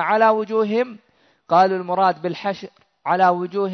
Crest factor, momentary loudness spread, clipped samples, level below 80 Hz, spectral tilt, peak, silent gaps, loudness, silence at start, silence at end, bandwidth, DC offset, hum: 16 dB; 11 LU; under 0.1%; -70 dBFS; -7 dB/octave; -4 dBFS; none; -19 LUFS; 0 s; 0 s; 6.4 kHz; under 0.1%; none